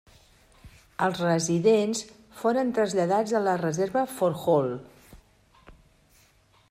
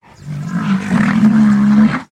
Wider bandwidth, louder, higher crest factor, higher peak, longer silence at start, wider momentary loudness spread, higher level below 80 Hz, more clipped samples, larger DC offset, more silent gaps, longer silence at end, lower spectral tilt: first, 15.5 kHz vs 9.2 kHz; second, -25 LUFS vs -13 LUFS; first, 18 dB vs 12 dB; second, -10 dBFS vs 0 dBFS; first, 0.65 s vs 0.25 s; second, 10 LU vs 13 LU; second, -62 dBFS vs -44 dBFS; neither; neither; neither; first, 1 s vs 0.1 s; second, -5.5 dB/octave vs -7.5 dB/octave